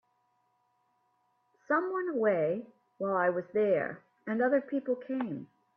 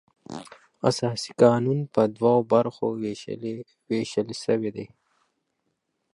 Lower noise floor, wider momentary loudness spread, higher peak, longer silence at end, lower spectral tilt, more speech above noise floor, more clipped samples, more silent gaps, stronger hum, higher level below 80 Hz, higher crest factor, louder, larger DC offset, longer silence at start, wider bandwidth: about the same, -74 dBFS vs -77 dBFS; second, 10 LU vs 20 LU; second, -16 dBFS vs -4 dBFS; second, 0.3 s vs 1.25 s; first, -9.5 dB/octave vs -6.5 dB/octave; second, 44 dB vs 53 dB; neither; neither; neither; second, -80 dBFS vs -68 dBFS; second, 16 dB vs 22 dB; second, -31 LUFS vs -25 LUFS; neither; first, 1.7 s vs 0.3 s; second, 4.7 kHz vs 11.5 kHz